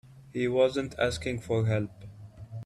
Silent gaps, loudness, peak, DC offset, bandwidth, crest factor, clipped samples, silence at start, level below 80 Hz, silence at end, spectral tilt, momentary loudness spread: none; -29 LUFS; -12 dBFS; under 0.1%; 12.5 kHz; 16 dB; under 0.1%; 0.05 s; -54 dBFS; 0 s; -6 dB/octave; 22 LU